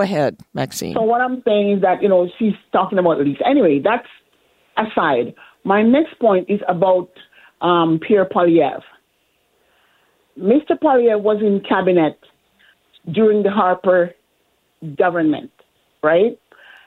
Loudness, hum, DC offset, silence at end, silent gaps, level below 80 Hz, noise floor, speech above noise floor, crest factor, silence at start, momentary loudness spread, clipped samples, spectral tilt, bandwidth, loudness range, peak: -17 LUFS; none; under 0.1%; 0.5 s; none; -62 dBFS; -64 dBFS; 48 dB; 16 dB; 0 s; 9 LU; under 0.1%; -6.5 dB/octave; 16 kHz; 2 LU; -2 dBFS